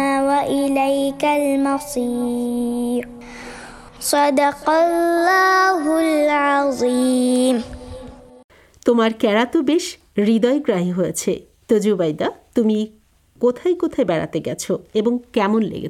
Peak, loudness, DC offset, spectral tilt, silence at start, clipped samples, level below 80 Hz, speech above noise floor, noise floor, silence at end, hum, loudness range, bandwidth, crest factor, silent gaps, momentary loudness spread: -4 dBFS; -18 LUFS; under 0.1%; -4.5 dB/octave; 0 s; under 0.1%; -52 dBFS; 20 dB; -38 dBFS; 0 s; none; 5 LU; 15 kHz; 16 dB; 8.44-8.49 s; 9 LU